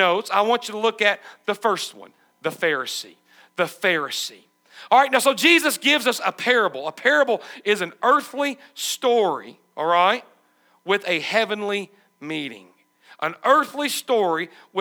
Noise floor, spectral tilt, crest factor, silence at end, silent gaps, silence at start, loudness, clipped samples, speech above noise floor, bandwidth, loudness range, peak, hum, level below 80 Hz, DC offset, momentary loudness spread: -61 dBFS; -2.5 dB/octave; 20 dB; 0 s; none; 0 s; -21 LUFS; under 0.1%; 39 dB; over 20 kHz; 6 LU; -2 dBFS; none; -82 dBFS; under 0.1%; 13 LU